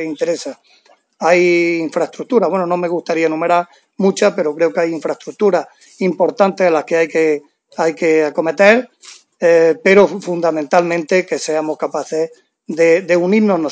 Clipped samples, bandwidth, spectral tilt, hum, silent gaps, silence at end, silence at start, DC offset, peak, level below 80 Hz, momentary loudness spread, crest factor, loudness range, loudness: under 0.1%; 8 kHz; -5.5 dB/octave; none; none; 0 s; 0 s; under 0.1%; 0 dBFS; -72 dBFS; 10 LU; 16 dB; 3 LU; -15 LUFS